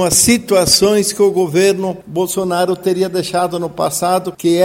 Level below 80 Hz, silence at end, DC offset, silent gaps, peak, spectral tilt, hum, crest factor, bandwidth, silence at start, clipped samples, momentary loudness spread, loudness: -44 dBFS; 0 s; under 0.1%; none; 0 dBFS; -3.5 dB/octave; none; 14 dB; 16.5 kHz; 0 s; under 0.1%; 9 LU; -14 LUFS